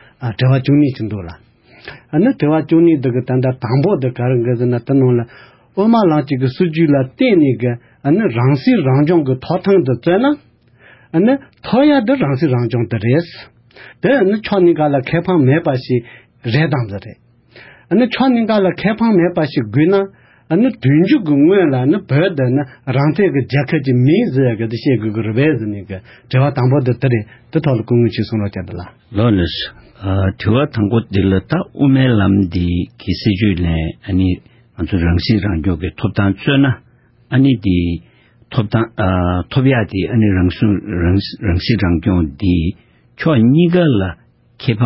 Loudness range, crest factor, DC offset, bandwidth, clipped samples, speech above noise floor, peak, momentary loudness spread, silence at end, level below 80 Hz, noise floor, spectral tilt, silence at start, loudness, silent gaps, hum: 3 LU; 14 dB; under 0.1%; 5.8 kHz; under 0.1%; 33 dB; -2 dBFS; 9 LU; 0 s; -32 dBFS; -46 dBFS; -12.5 dB/octave; 0.2 s; -15 LUFS; none; none